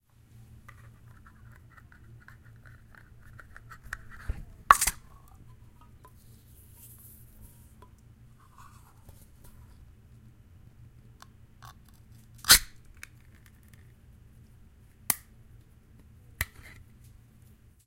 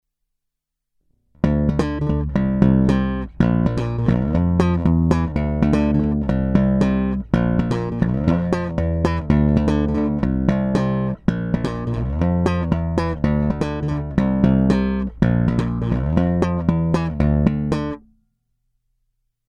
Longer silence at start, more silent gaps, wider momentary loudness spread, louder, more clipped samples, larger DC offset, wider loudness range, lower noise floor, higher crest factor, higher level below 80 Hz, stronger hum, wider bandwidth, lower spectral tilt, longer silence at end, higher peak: first, 3.9 s vs 1.45 s; neither; first, 33 LU vs 6 LU; second, -25 LUFS vs -20 LUFS; neither; neither; first, 15 LU vs 2 LU; second, -57 dBFS vs -80 dBFS; first, 36 dB vs 18 dB; second, -50 dBFS vs -30 dBFS; neither; first, 16.5 kHz vs 9.2 kHz; second, 0 dB/octave vs -9 dB/octave; about the same, 1.4 s vs 1.5 s; about the same, 0 dBFS vs 0 dBFS